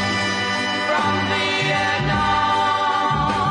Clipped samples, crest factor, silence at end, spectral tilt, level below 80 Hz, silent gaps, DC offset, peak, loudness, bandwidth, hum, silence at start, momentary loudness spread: under 0.1%; 12 dB; 0 s; -4 dB/octave; -42 dBFS; none; under 0.1%; -8 dBFS; -19 LUFS; 11 kHz; none; 0 s; 2 LU